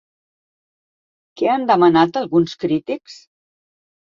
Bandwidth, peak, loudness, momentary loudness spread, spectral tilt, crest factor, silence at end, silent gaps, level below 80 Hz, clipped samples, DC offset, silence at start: 7.4 kHz; -2 dBFS; -17 LUFS; 10 LU; -7 dB/octave; 18 dB; 0.9 s; none; -60 dBFS; under 0.1%; under 0.1%; 1.35 s